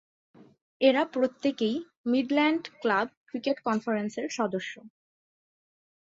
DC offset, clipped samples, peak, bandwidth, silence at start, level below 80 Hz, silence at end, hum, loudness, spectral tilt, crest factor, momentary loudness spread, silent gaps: under 0.1%; under 0.1%; -10 dBFS; 7.8 kHz; 0.4 s; -76 dBFS; 1.15 s; none; -28 LUFS; -5 dB/octave; 20 dB; 10 LU; 0.62-0.80 s, 1.97-2.04 s, 3.17-3.26 s